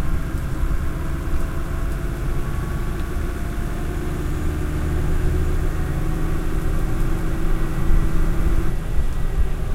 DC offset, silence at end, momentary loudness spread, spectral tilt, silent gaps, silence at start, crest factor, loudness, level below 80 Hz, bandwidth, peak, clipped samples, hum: under 0.1%; 0 s; 4 LU; -7 dB/octave; none; 0 s; 14 dB; -26 LUFS; -22 dBFS; 15 kHz; -4 dBFS; under 0.1%; none